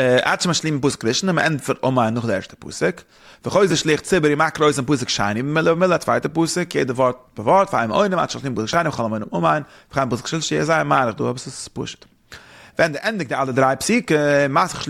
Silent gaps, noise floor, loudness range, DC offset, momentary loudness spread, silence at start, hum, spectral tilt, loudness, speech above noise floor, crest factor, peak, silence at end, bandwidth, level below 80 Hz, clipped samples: none; -44 dBFS; 3 LU; under 0.1%; 8 LU; 0 s; none; -4.5 dB/octave; -19 LUFS; 24 dB; 18 dB; -2 dBFS; 0 s; 15.5 kHz; -52 dBFS; under 0.1%